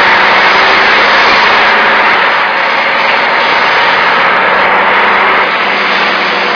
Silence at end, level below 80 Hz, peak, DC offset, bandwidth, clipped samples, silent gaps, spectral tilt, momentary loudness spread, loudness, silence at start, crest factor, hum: 0 s; -44 dBFS; 0 dBFS; under 0.1%; 5.4 kHz; 2%; none; -3 dB/octave; 4 LU; -6 LUFS; 0 s; 8 dB; none